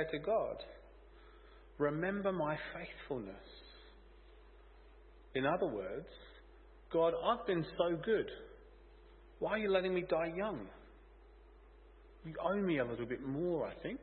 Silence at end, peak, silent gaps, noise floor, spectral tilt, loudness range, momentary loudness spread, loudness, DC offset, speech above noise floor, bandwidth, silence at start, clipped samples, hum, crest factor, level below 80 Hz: 0 s; -18 dBFS; none; -60 dBFS; -4.5 dB/octave; 6 LU; 20 LU; -37 LUFS; under 0.1%; 23 dB; 4.3 kHz; 0 s; under 0.1%; none; 20 dB; -60 dBFS